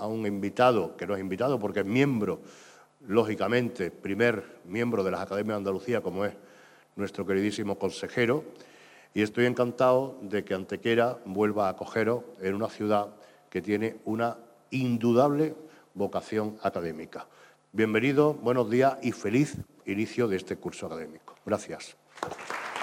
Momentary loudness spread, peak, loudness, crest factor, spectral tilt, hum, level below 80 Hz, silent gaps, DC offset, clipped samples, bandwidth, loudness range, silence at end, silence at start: 14 LU; -10 dBFS; -29 LUFS; 20 dB; -6.5 dB/octave; none; -70 dBFS; none; under 0.1%; under 0.1%; 16 kHz; 4 LU; 0 s; 0 s